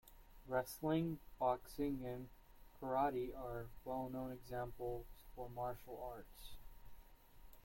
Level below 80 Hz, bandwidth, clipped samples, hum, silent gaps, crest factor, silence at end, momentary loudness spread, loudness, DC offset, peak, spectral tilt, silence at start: -60 dBFS; 16.5 kHz; under 0.1%; none; none; 20 dB; 0 s; 19 LU; -44 LUFS; under 0.1%; -26 dBFS; -6.5 dB/octave; 0.05 s